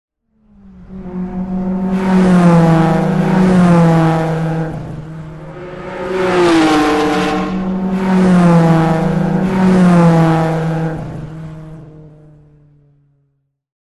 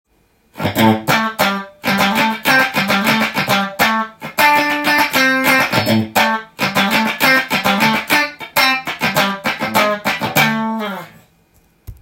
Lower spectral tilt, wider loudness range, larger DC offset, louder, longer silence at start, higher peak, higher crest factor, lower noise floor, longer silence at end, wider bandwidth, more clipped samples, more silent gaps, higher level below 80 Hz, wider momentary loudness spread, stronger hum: first, -7.5 dB/octave vs -3.5 dB/octave; about the same, 4 LU vs 2 LU; first, 0.2% vs under 0.1%; about the same, -12 LUFS vs -14 LUFS; first, 0.8 s vs 0.55 s; about the same, -2 dBFS vs 0 dBFS; about the same, 12 dB vs 16 dB; first, -64 dBFS vs -57 dBFS; first, 1.8 s vs 0.1 s; second, 11.5 kHz vs 17 kHz; neither; neither; first, -38 dBFS vs -50 dBFS; first, 19 LU vs 7 LU; neither